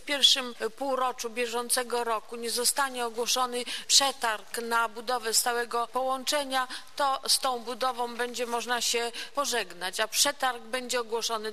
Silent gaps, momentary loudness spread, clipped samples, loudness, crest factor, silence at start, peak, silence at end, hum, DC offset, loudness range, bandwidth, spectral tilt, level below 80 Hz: none; 10 LU; under 0.1%; -27 LUFS; 22 dB; 0.05 s; -6 dBFS; 0 s; none; 0.5%; 2 LU; 14 kHz; 0.5 dB/octave; -70 dBFS